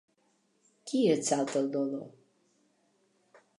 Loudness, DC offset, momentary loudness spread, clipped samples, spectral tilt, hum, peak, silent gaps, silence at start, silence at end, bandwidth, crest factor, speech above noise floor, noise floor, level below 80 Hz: -30 LUFS; under 0.1%; 18 LU; under 0.1%; -4.5 dB/octave; none; -14 dBFS; none; 0.85 s; 1.5 s; 11 kHz; 20 dB; 43 dB; -72 dBFS; -86 dBFS